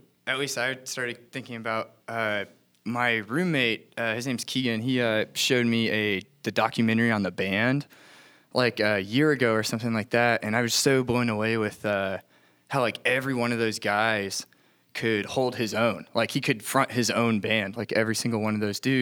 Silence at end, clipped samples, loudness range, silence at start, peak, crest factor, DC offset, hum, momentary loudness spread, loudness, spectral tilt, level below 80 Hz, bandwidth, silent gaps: 0 s; under 0.1%; 3 LU; 0.25 s; -6 dBFS; 20 dB; under 0.1%; none; 8 LU; -26 LUFS; -4.5 dB/octave; -68 dBFS; 19 kHz; none